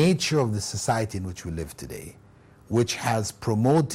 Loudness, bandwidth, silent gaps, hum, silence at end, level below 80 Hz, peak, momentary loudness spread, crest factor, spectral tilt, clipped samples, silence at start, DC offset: -26 LUFS; 16 kHz; none; none; 0 s; -52 dBFS; -10 dBFS; 16 LU; 14 dB; -5.5 dB/octave; under 0.1%; 0 s; under 0.1%